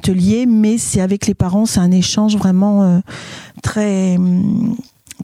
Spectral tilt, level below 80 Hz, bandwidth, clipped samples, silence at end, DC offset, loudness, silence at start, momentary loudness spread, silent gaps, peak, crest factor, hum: -6 dB/octave; -40 dBFS; 14 kHz; under 0.1%; 0 s; under 0.1%; -14 LUFS; 0.05 s; 10 LU; none; -2 dBFS; 12 dB; none